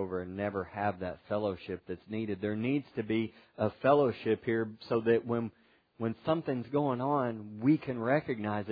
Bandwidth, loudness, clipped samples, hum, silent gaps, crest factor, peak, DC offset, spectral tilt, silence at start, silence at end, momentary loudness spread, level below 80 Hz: 5 kHz; -33 LUFS; under 0.1%; none; none; 20 dB; -12 dBFS; under 0.1%; -6 dB/octave; 0 s; 0 s; 9 LU; -68 dBFS